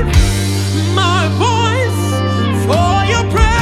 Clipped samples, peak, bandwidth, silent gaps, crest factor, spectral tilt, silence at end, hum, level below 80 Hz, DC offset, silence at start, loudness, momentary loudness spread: under 0.1%; 0 dBFS; 14 kHz; none; 12 dB; -5 dB/octave; 0 s; none; -20 dBFS; under 0.1%; 0 s; -14 LUFS; 3 LU